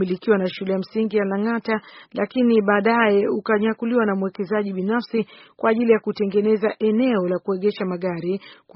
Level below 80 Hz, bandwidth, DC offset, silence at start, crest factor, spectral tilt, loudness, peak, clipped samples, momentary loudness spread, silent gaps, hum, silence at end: -66 dBFS; 5.8 kHz; under 0.1%; 0 s; 18 dB; -5.5 dB/octave; -21 LUFS; -4 dBFS; under 0.1%; 9 LU; none; none; 0.25 s